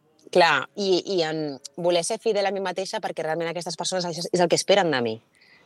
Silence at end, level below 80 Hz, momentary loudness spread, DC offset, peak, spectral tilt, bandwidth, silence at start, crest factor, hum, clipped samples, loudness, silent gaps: 0.45 s; -78 dBFS; 10 LU; under 0.1%; -6 dBFS; -3.5 dB/octave; 12.5 kHz; 0.35 s; 20 dB; none; under 0.1%; -24 LUFS; none